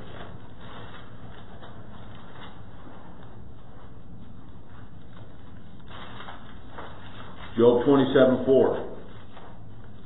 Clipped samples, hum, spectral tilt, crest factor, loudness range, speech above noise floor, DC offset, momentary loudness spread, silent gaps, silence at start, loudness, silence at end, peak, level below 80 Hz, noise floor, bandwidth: under 0.1%; none; -11 dB/octave; 22 dB; 23 LU; 27 dB; 2%; 27 LU; none; 0 s; -21 LUFS; 0.4 s; -6 dBFS; -52 dBFS; -46 dBFS; 4.1 kHz